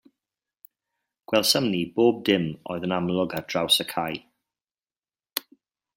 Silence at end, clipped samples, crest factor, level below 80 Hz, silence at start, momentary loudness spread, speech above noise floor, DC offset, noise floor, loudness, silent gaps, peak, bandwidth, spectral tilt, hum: 0.55 s; under 0.1%; 26 dB; -66 dBFS; 1.3 s; 12 LU; over 66 dB; under 0.1%; under -90 dBFS; -24 LUFS; none; -2 dBFS; 16.5 kHz; -4 dB/octave; none